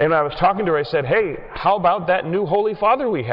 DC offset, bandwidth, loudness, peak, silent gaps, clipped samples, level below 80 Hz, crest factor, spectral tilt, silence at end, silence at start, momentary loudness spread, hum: under 0.1%; 5.6 kHz; -19 LUFS; -6 dBFS; none; under 0.1%; -46 dBFS; 12 dB; -9 dB/octave; 0 s; 0 s; 3 LU; none